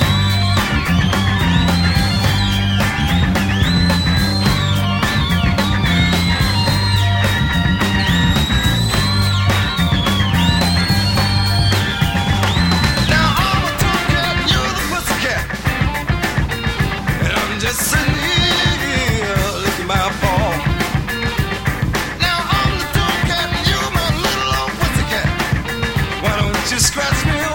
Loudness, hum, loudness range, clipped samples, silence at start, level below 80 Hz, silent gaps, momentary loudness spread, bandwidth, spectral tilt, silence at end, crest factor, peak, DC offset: -16 LUFS; none; 3 LU; under 0.1%; 0 s; -26 dBFS; none; 4 LU; 17 kHz; -4.5 dB/octave; 0 s; 14 dB; -2 dBFS; under 0.1%